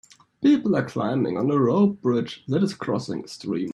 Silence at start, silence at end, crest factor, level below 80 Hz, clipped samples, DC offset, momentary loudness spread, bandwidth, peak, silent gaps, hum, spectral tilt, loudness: 0.4 s; 0 s; 14 dB; -64 dBFS; under 0.1%; under 0.1%; 9 LU; 11 kHz; -8 dBFS; none; none; -7.5 dB/octave; -23 LUFS